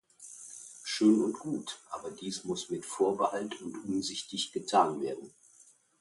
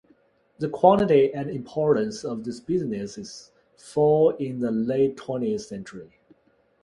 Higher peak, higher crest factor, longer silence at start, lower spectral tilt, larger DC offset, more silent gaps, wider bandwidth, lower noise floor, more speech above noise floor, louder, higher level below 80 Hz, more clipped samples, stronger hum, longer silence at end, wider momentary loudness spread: second, -12 dBFS vs -4 dBFS; about the same, 20 dB vs 22 dB; second, 0.2 s vs 0.6 s; second, -4 dB/octave vs -7 dB/octave; neither; neither; about the same, 11.5 kHz vs 11.5 kHz; about the same, -62 dBFS vs -64 dBFS; second, 30 dB vs 40 dB; second, -32 LUFS vs -24 LUFS; second, -74 dBFS vs -60 dBFS; neither; neither; about the same, 0.7 s vs 0.8 s; about the same, 17 LU vs 18 LU